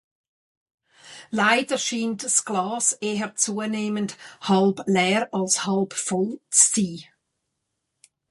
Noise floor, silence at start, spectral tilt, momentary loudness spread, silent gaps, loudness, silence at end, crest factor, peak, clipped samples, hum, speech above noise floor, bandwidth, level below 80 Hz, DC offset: -79 dBFS; 1.05 s; -3 dB/octave; 10 LU; none; -22 LUFS; 1.3 s; 22 dB; -2 dBFS; under 0.1%; none; 56 dB; 11.5 kHz; -70 dBFS; under 0.1%